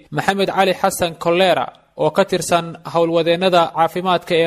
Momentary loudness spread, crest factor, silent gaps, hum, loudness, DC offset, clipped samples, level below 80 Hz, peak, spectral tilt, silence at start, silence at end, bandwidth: 5 LU; 16 dB; none; none; -17 LUFS; under 0.1%; under 0.1%; -52 dBFS; 0 dBFS; -4.5 dB/octave; 0.1 s; 0 s; 15 kHz